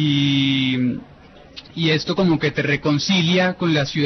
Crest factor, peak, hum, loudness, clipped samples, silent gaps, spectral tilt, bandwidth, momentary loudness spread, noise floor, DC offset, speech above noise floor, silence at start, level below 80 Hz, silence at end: 14 dB; -6 dBFS; none; -19 LUFS; under 0.1%; none; -5.5 dB/octave; 6.4 kHz; 7 LU; -45 dBFS; under 0.1%; 26 dB; 0 s; -52 dBFS; 0 s